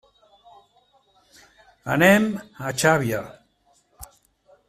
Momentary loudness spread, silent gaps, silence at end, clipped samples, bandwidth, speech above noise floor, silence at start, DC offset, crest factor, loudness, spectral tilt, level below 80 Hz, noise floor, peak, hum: 17 LU; none; 0.65 s; under 0.1%; 16 kHz; 43 dB; 1.85 s; under 0.1%; 22 dB; -20 LUFS; -5 dB/octave; -58 dBFS; -63 dBFS; -2 dBFS; none